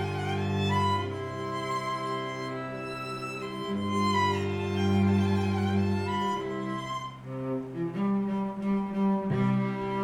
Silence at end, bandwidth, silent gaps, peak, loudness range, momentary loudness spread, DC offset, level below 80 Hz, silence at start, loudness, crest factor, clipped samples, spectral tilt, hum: 0 s; 12 kHz; none; -14 dBFS; 4 LU; 9 LU; under 0.1%; -62 dBFS; 0 s; -30 LUFS; 16 dB; under 0.1%; -7 dB/octave; none